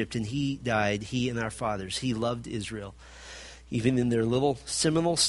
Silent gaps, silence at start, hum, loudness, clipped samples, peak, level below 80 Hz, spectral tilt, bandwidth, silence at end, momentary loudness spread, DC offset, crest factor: none; 0 s; none; -29 LUFS; under 0.1%; -12 dBFS; -52 dBFS; -4.5 dB/octave; 11.5 kHz; 0 s; 18 LU; under 0.1%; 18 dB